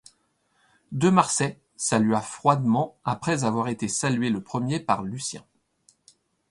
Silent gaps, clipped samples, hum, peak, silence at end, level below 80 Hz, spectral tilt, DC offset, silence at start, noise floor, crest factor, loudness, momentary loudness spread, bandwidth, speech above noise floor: none; under 0.1%; none; -4 dBFS; 1.1 s; -62 dBFS; -5 dB/octave; under 0.1%; 0.9 s; -69 dBFS; 22 dB; -25 LUFS; 9 LU; 11.5 kHz; 45 dB